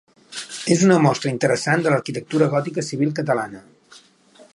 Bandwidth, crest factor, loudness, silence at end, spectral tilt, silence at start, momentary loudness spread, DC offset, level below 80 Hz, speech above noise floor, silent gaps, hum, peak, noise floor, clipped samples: 11.5 kHz; 18 dB; -20 LUFS; 0.95 s; -5.5 dB/octave; 0.3 s; 14 LU; under 0.1%; -66 dBFS; 32 dB; none; none; -2 dBFS; -51 dBFS; under 0.1%